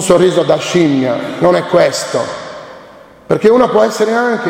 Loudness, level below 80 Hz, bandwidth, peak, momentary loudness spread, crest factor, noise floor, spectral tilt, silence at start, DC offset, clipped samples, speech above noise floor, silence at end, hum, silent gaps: -12 LUFS; -50 dBFS; 16.5 kHz; 0 dBFS; 11 LU; 12 dB; -38 dBFS; -5 dB/octave; 0 s; under 0.1%; under 0.1%; 27 dB; 0 s; none; none